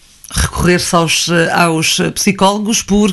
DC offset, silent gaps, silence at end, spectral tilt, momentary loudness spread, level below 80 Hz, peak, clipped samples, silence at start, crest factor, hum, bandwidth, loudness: under 0.1%; none; 0 s; -3.5 dB/octave; 4 LU; -30 dBFS; 0 dBFS; under 0.1%; 0.3 s; 12 dB; none; 12.5 kHz; -12 LUFS